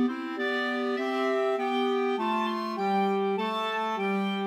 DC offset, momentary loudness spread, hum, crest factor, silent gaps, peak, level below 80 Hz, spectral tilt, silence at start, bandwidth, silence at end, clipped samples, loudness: under 0.1%; 3 LU; none; 12 dB; none; -16 dBFS; -88 dBFS; -6 dB/octave; 0 s; 14 kHz; 0 s; under 0.1%; -28 LUFS